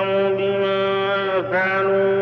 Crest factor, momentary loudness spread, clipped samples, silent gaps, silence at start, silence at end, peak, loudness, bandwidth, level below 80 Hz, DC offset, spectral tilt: 10 dB; 2 LU; under 0.1%; none; 0 s; 0 s; -10 dBFS; -20 LUFS; 5.8 kHz; -64 dBFS; under 0.1%; -3 dB/octave